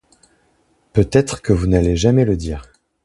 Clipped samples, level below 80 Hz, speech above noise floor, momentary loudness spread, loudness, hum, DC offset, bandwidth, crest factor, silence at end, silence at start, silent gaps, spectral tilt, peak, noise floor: under 0.1%; -30 dBFS; 44 dB; 9 LU; -17 LUFS; none; under 0.1%; 11.5 kHz; 18 dB; 0.4 s; 0.95 s; none; -7 dB/octave; 0 dBFS; -60 dBFS